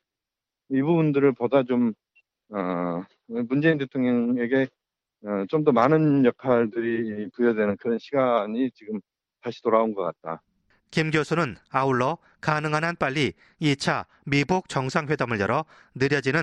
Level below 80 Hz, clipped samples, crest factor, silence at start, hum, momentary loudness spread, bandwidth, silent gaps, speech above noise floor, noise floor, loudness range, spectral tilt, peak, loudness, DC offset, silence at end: -62 dBFS; under 0.1%; 18 dB; 0.7 s; none; 11 LU; 10.5 kHz; none; 64 dB; -88 dBFS; 4 LU; -6.5 dB/octave; -6 dBFS; -24 LUFS; under 0.1%; 0 s